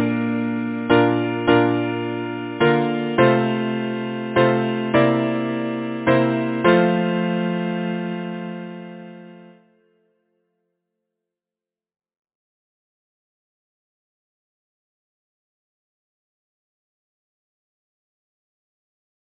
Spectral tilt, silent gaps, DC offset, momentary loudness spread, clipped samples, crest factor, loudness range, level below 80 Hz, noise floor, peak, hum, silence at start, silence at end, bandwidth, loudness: -10.5 dB/octave; none; under 0.1%; 12 LU; under 0.1%; 20 dB; 12 LU; -58 dBFS; under -90 dBFS; -2 dBFS; none; 0 s; 9.8 s; 4 kHz; -20 LUFS